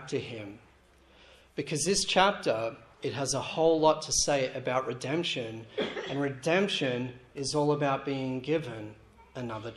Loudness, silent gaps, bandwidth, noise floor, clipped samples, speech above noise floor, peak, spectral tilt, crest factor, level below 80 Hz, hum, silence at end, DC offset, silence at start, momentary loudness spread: -29 LUFS; none; 13 kHz; -60 dBFS; under 0.1%; 30 dB; -8 dBFS; -3.5 dB/octave; 22 dB; -60 dBFS; none; 0 s; under 0.1%; 0 s; 15 LU